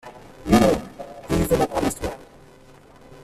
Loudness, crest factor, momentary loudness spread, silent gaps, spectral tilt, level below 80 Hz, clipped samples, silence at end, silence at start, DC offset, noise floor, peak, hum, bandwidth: -21 LUFS; 18 dB; 21 LU; none; -5.5 dB/octave; -38 dBFS; under 0.1%; 0.1 s; 0.05 s; under 0.1%; -48 dBFS; -4 dBFS; none; 15 kHz